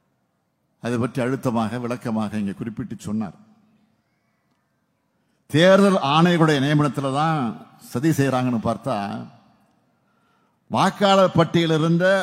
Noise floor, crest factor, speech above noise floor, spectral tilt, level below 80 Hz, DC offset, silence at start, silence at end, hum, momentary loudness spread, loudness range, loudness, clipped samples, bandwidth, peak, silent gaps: -70 dBFS; 20 dB; 50 dB; -6 dB/octave; -62 dBFS; under 0.1%; 0.85 s; 0 s; none; 14 LU; 11 LU; -20 LUFS; under 0.1%; 16 kHz; -2 dBFS; none